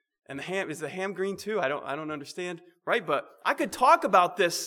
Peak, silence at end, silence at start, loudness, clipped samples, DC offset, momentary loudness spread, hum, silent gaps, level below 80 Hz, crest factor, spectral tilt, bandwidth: -8 dBFS; 0 s; 0.3 s; -27 LUFS; under 0.1%; under 0.1%; 15 LU; none; none; -72 dBFS; 20 dB; -3.5 dB/octave; 19 kHz